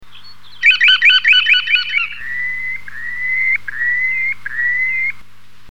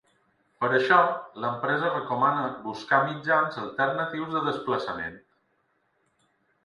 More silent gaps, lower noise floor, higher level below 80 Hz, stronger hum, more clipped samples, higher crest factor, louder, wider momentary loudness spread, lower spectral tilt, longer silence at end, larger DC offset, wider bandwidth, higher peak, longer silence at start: neither; second, -46 dBFS vs -71 dBFS; first, -60 dBFS vs -68 dBFS; first, 50 Hz at -50 dBFS vs none; neither; second, 16 dB vs 22 dB; first, -13 LUFS vs -26 LUFS; about the same, 13 LU vs 11 LU; second, 1 dB/octave vs -6 dB/octave; second, 0.55 s vs 1.45 s; first, 4% vs under 0.1%; first, 17 kHz vs 11 kHz; first, -2 dBFS vs -6 dBFS; second, 0 s vs 0.6 s